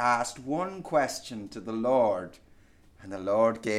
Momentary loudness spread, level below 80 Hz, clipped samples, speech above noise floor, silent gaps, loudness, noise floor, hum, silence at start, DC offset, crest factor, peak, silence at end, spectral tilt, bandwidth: 14 LU; -62 dBFS; under 0.1%; 29 dB; none; -29 LUFS; -57 dBFS; none; 0 s; under 0.1%; 18 dB; -10 dBFS; 0 s; -4.5 dB/octave; 15 kHz